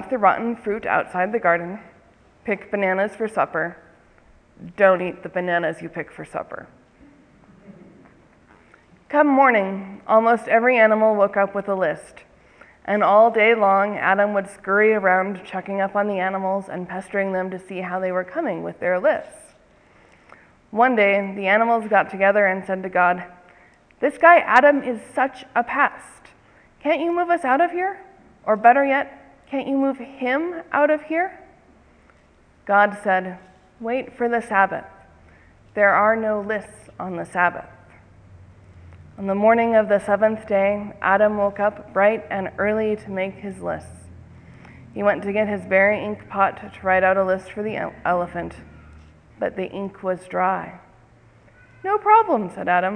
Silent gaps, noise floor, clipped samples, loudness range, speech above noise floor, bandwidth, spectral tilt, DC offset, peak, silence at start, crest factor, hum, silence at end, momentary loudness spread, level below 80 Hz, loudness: none; -55 dBFS; under 0.1%; 8 LU; 35 dB; 10.5 kHz; -6.5 dB/octave; under 0.1%; 0 dBFS; 0 s; 22 dB; none; 0 s; 15 LU; -58 dBFS; -20 LUFS